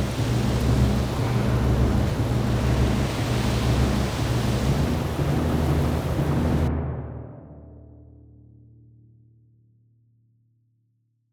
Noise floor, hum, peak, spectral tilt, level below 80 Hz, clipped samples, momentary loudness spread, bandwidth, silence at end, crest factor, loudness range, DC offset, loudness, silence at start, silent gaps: -69 dBFS; none; -8 dBFS; -6.5 dB/octave; -32 dBFS; under 0.1%; 8 LU; over 20 kHz; 3.5 s; 16 dB; 8 LU; under 0.1%; -24 LUFS; 0 s; none